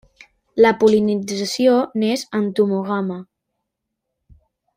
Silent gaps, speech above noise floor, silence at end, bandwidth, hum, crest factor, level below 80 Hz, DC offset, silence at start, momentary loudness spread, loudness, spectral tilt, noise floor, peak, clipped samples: none; 61 dB; 1.55 s; 16 kHz; none; 18 dB; -60 dBFS; under 0.1%; 0.55 s; 10 LU; -18 LUFS; -5.5 dB/octave; -79 dBFS; -2 dBFS; under 0.1%